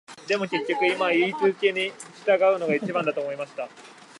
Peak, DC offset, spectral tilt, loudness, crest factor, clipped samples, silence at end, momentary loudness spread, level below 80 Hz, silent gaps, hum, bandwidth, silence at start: -8 dBFS; under 0.1%; -5 dB/octave; -24 LUFS; 16 dB; under 0.1%; 0.3 s; 11 LU; -80 dBFS; none; none; 11.5 kHz; 0.1 s